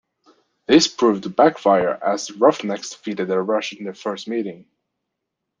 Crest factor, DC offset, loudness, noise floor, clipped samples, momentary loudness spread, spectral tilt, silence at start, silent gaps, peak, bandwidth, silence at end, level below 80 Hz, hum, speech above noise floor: 20 dB; under 0.1%; -20 LUFS; -80 dBFS; under 0.1%; 13 LU; -4 dB/octave; 0.7 s; none; -2 dBFS; 9.6 kHz; 1.05 s; -64 dBFS; none; 61 dB